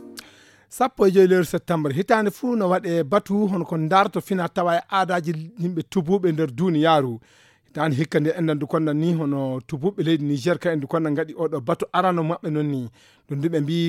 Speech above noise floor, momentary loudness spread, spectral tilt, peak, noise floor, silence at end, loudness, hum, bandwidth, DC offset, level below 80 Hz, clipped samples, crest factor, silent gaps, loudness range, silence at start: 30 dB; 9 LU; -7 dB/octave; -4 dBFS; -51 dBFS; 0 s; -22 LUFS; none; 16 kHz; under 0.1%; -62 dBFS; under 0.1%; 18 dB; none; 3 LU; 0 s